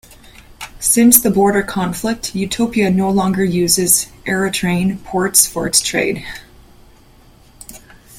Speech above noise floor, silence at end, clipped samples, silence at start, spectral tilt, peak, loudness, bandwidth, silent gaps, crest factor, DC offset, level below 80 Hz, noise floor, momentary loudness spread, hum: 31 dB; 0 s; under 0.1%; 0.5 s; -3.5 dB/octave; 0 dBFS; -14 LUFS; 16.5 kHz; none; 16 dB; under 0.1%; -44 dBFS; -46 dBFS; 11 LU; none